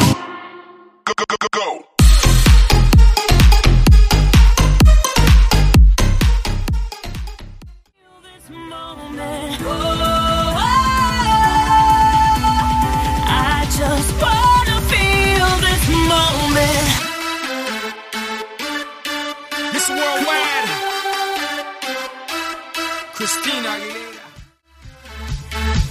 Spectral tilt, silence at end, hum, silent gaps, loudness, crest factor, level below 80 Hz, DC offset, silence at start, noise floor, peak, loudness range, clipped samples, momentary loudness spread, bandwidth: -4 dB/octave; 0 s; none; none; -16 LUFS; 14 dB; -18 dBFS; under 0.1%; 0 s; -48 dBFS; 0 dBFS; 11 LU; under 0.1%; 14 LU; 15.5 kHz